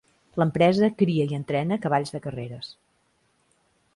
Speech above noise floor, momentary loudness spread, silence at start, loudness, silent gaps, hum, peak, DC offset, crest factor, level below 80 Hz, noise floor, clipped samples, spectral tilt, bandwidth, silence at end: 44 dB; 15 LU; 0.35 s; -24 LUFS; none; none; -6 dBFS; under 0.1%; 20 dB; -62 dBFS; -68 dBFS; under 0.1%; -7.5 dB/octave; 11.5 kHz; 1.25 s